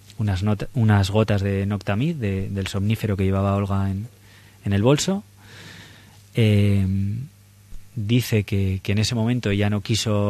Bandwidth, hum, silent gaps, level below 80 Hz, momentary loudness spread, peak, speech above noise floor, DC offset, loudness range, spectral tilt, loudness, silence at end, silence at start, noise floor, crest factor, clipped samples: 14 kHz; none; none; -46 dBFS; 14 LU; -6 dBFS; 26 dB; under 0.1%; 2 LU; -6 dB/octave; -22 LUFS; 0 s; 0.1 s; -47 dBFS; 16 dB; under 0.1%